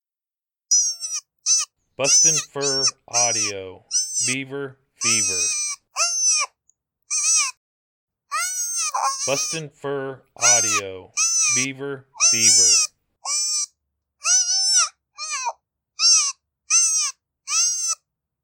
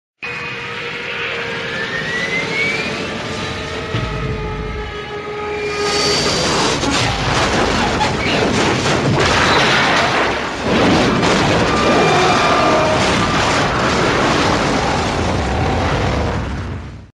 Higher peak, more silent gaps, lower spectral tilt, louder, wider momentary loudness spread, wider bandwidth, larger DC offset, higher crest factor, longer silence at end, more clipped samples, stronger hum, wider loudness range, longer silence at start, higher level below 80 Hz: about the same, -4 dBFS vs -2 dBFS; first, 7.57-8.07 s vs none; second, 0.5 dB/octave vs -4 dB/octave; about the same, -18 LUFS vs -16 LUFS; first, 14 LU vs 11 LU; first, 17.5 kHz vs 13 kHz; neither; about the same, 18 dB vs 16 dB; first, 0.5 s vs 0.1 s; neither; neither; about the same, 5 LU vs 7 LU; first, 0.7 s vs 0.2 s; second, -74 dBFS vs -32 dBFS